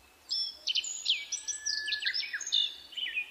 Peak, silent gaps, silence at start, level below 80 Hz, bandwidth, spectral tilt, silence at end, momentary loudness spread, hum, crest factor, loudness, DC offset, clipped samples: -16 dBFS; none; 0.3 s; -74 dBFS; 15.5 kHz; 4 dB/octave; 0 s; 5 LU; none; 18 dB; -31 LUFS; under 0.1%; under 0.1%